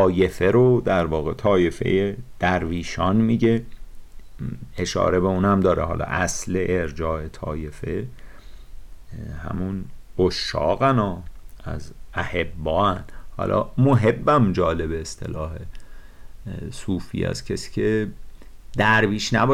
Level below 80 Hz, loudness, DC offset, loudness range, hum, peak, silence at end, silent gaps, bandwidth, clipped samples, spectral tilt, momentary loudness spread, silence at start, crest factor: -38 dBFS; -22 LUFS; under 0.1%; 7 LU; none; -8 dBFS; 0 s; none; 15 kHz; under 0.1%; -6 dB/octave; 16 LU; 0 s; 14 dB